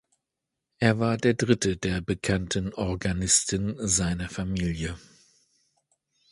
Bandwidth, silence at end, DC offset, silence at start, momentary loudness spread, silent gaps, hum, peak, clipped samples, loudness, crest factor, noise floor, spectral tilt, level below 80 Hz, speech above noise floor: 11.5 kHz; 1.35 s; under 0.1%; 0.8 s; 9 LU; none; none; -6 dBFS; under 0.1%; -26 LUFS; 22 dB; -85 dBFS; -4 dB/octave; -44 dBFS; 59 dB